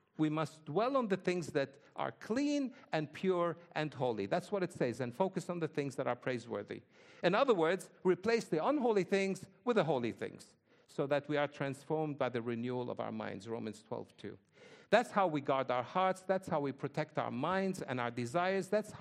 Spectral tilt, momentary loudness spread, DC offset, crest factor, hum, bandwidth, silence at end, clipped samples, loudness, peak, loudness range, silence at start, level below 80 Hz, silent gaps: -6 dB/octave; 10 LU; under 0.1%; 22 dB; none; 13 kHz; 0 s; under 0.1%; -36 LUFS; -14 dBFS; 4 LU; 0.2 s; -80 dBFS; none